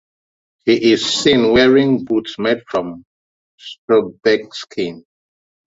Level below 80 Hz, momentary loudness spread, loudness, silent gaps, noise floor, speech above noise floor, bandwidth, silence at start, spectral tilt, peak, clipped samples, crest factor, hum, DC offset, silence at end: -50 dBFS; 16 LU; -15 LUFS; 3.05-3.58 s, 3.78-3.88 s; under -90 dBFS; over 75 dB; 8 kHz; 0.65 s; -4.5 dB/octave; -2 dBFS; under 0.1%; 16 dB; none; under 0.1%; 0.7 s